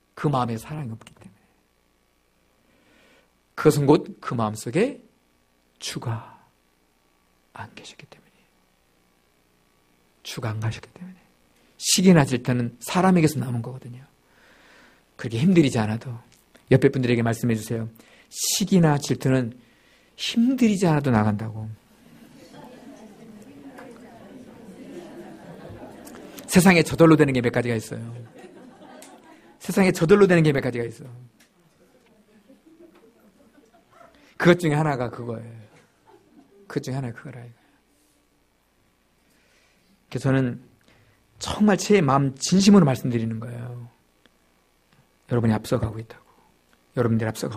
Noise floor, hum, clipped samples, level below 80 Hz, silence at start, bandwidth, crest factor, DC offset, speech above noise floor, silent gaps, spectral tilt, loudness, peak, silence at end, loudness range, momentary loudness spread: -65 dBFS; none; under 0.1%; -54 dBFS; 0.15 s; 15.5 kHz; 22 dB; under 0.1%; 44 dB; none; -5.5 dB/octave; -22 LUFS; -2 dBFS; 0 s; 17 LU; 26 LU